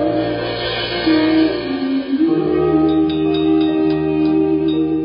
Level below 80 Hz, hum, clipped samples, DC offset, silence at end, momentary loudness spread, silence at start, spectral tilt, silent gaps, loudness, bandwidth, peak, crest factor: -42 dBFS; none; under 0.1%; under 0.1%; 0 s; 5 LU; 0 s; -4.5 dB/octave; none; -16 LUFS; 5.2 kHz; -4 dBFS; 12 dB